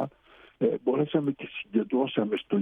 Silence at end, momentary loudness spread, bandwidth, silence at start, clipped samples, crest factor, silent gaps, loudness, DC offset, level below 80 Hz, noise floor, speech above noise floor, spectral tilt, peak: 0 s; 6 LU; 3.9 kHz; 0 s; under 0.1%; 16 dB; none; -28 LUFS; under 0.1%; -70 dBFS; -56 dBFS; 29 dB; -9 dB/octave; -12 dBFS